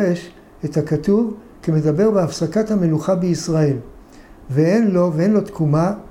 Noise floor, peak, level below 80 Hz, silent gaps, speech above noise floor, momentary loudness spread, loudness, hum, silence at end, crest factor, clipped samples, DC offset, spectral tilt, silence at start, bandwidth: -42 dBFS; -6 dBFS; -46 dBFS; none; 25 dB; 8 LU; -18 LUFS; none; 0.05 s; 12 dB; under 0.1%; under 0.1%; -7.5 dB/octave; 0 s; 13 kHz